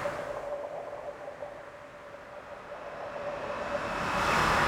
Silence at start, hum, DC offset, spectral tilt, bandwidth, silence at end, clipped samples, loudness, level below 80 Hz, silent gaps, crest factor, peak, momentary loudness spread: 0 s; none; under 0.1%; -4 dB/octave; 19.5 kHz; 0 s; under 0.1%; -34 LUFS; -52 dBFS; none; 20 dB; -14 dBFS; 18 LU